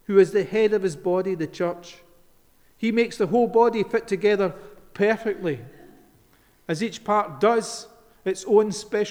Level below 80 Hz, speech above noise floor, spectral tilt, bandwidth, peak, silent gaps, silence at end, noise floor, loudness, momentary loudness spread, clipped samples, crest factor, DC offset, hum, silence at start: -60 dBFS; 36 dB; -5.5 dB/octave; 13 kHz; -6 dBFS; none; 0 s; -58 dBFS; -23 LUFS; 12 LU; under 0.1%; 18 dB; under 0.1%; none; 0.1 s